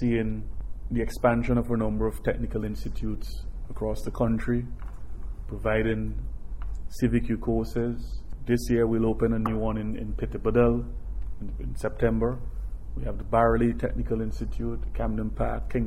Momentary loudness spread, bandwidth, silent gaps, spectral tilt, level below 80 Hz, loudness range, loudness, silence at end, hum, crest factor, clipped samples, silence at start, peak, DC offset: 15 LU; 13.5 kHz; none; -8 dB/octave; -34 dBFS; 4 LU; -28 LUFS; 0 s; none; 18 dB; under 0.1%; 0 s; -8 dBFS; under 0.1%